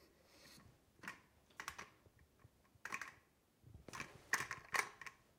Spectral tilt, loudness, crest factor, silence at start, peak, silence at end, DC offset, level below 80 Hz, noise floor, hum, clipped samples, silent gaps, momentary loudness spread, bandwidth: -1.5 dB/octave; -46 LUFS; 32 dB; 0 s; -20 dBFS; 0.2 s; under 0.1%; -76 dBFS; -73 dBFS; none; under 0.1%; none; 21 LU; 16.5 kHz